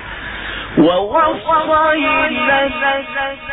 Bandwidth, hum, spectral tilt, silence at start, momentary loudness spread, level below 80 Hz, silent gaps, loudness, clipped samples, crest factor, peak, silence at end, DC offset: 4.1 kHz; none; -8.5 dB/octave; 0 s; 11 LU; -40 dBFS; none; -15 LUFS; under 0.1%; 14 dB; -2 dBFS; 0 s; under 0.1%